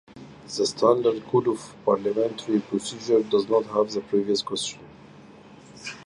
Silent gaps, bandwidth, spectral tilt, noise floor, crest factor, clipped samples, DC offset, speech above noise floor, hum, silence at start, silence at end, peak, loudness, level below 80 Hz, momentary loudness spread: none; 11.5 kHz; -4.5 dB/octave; -48 dBFS; 18 dB; under 0.1%; under 0.1%; 24 dB; none; 0.15 s; 0.05 s; -6 dBFS; -24 LUFS; -66 dBFS; 12 LU